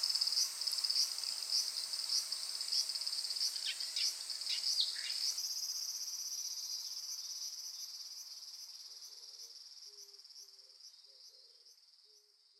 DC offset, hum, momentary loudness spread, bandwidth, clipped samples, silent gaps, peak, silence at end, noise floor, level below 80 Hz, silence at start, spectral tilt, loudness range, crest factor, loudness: under 0.1%; none; 20 LU; 17 kHz; under 0.1%; none; -18 dBFS; 0.4 s; -67 dBFS; under -90 dBFS; 0 s; 5.5 dB/octave; 17 LU; 24 dB; -36 LUFS